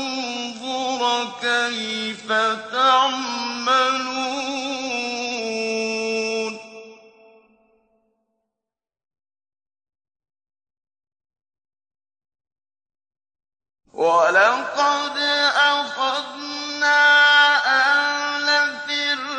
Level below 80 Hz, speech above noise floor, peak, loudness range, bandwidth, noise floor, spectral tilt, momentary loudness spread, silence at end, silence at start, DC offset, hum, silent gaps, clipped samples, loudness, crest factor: -74 dBFS; 67 dB; -6 dBFS; 11 LU; 9.6 kHz; -88 dBFS; -1 dB/octave; 11 LU; 0 s; 0 s; under 0.1%; none; none; under 0.1%; -19 LUFS; 16 dB